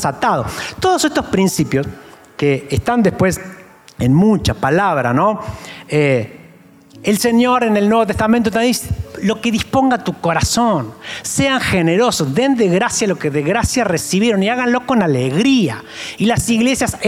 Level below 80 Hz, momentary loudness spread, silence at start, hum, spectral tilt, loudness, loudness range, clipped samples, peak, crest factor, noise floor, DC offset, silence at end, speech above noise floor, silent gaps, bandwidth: -40 dBFS; 7 LU; 0 s; none; -5 dB/octave; -15 LUFS; 2 LU; under 0.1%; -4 dBFS; 12 dB; -44 dBFS; under 0.1%; 0 s; 29 dB; none; 16.5 kHz